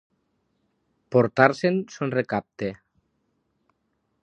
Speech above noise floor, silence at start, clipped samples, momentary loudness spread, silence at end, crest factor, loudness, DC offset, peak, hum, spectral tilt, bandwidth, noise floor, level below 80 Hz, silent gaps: 51 dB; 1.1 s; under 0.1%; 14 LU; 1.45 s; 26 dB; -23 LUFS; under 0.1%; 0 dBFS; none; -7 dB/octave; 9.8 kHz; -74 dBFS; -66 dBFS; none